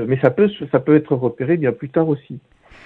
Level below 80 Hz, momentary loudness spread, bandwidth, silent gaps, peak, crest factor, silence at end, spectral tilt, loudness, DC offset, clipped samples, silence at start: -56 dBFS; 9 LU; 4.2 kHz; none; 0 dBFS; 18 dB; 0.45 s; -10.5 dB/octave; -18 LUFS; under 0.1%; under 0.1%; 0 s